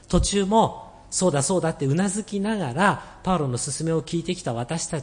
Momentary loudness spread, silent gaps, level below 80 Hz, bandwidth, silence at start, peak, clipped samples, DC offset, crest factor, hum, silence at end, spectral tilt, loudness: 7 LU; none; -40 dBFS; 10.5 kHz; 0.1 s; -4 dBFS; under 0.1%; under 0.1%; 20 dB; none; 0 s; -5 dB/octave; -24 LUFS